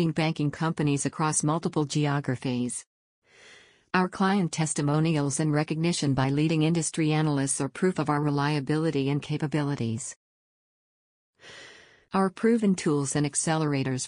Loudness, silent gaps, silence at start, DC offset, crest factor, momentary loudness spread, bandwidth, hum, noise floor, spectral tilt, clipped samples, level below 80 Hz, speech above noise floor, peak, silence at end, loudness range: -26 LUFS; 2.86-3.22 s, 10.16-11.33 s; 0 s; under 0.1%; 16 dB; 5 LU; 10 kHz; none; -55 dBFS; -5.5 dB/octave; under 0.1%; -62 dBFS; 29 dB; -10 dBFS; 0 s; 5 LU